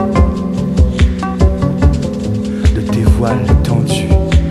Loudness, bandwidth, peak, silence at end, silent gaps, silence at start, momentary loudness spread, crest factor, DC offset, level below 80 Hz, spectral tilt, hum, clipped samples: -14 LUFS; 12 kHz; 0 dBFS; 0 s; none; 0 s; 5 LU; 12 dB; under 0.1%; -16 dBFS; -7.5 dB/octave; none; under 0.1%